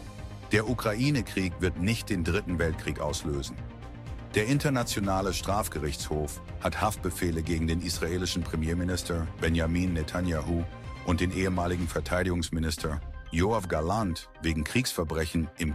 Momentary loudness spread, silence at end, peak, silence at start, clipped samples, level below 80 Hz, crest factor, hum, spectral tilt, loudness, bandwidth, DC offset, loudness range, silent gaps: 6 LU; 0 s; -10 dBFS; 0 s; under 0.1%; -40 dBFS; 18 dB; none; -5.5 dB/octave; -30 LUFS; 15.5 kHz; under 0.1%; 1 LU; none